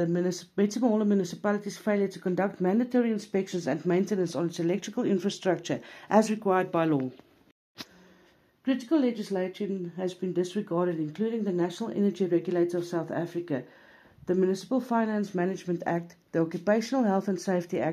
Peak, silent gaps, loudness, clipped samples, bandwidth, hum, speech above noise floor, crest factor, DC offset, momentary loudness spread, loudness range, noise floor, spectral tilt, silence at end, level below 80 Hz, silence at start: -8 dBFS; 7.52-7.75 s; -29 LUFS; under 0.1%; 14.5 kHz; none; 34 dB; 20 dB; under 0.1%; 8 LU; 3 LU; -62 dBFS; -6.5 dB/octave; 0 s; -76 dBFS; 0 s